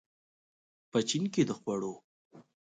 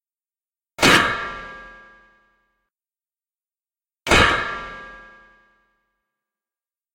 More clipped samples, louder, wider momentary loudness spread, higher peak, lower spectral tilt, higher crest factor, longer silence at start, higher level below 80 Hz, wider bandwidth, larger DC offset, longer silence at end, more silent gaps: neither; second, -32 LUFS vs -17 LUFS; second, 10 LU vs 24 LU; second, -16 dBFS vs 0 dBFS; first, -5 dB/octave vs -3 dB/octave; about the same, 20 dB vs 24 dB; first, 0.95 s vs 0.8 s; second, -76 dBFS vs -40 dBFS; second, 9.6 kHz vs 16.5 kHz; neither; second, 0.3 s vs 1.95 s; first, 2.04-2.30 s vs none